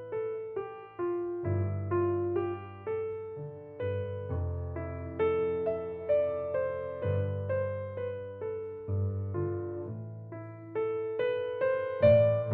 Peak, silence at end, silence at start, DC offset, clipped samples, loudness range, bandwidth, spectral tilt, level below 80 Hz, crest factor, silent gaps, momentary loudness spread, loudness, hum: -10 dBFS; 0 s; 0 s; under 0.1%; under 0.1%; 4 LU; 4.5 kHz; -8 dB/octave; -56 dBFS; 22 dB; none; 10 LU; -32 LUFS; none